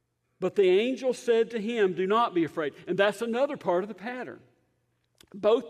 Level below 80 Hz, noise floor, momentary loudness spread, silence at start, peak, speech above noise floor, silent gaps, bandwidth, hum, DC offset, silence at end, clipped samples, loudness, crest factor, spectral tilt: -76 dBFS; -73 dBFS; 12 LU; 0.4 s; -10 dBFS; 47 dB; none; 12.5 kHz; none; under 0.1%; 0 s; under 0.1%; -27 LUFS; 18 dB; -5.5 dB/octave